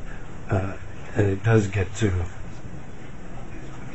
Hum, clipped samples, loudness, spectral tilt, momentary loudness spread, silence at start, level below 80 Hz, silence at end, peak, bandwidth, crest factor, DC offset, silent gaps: none; under 0.1%; -25 LUFS; -7 dB/octave; 19 LU; 0 s; -40 dBFS; 0 s; -6 dBFS; 8.2 kHz; 20 dB; 2%; none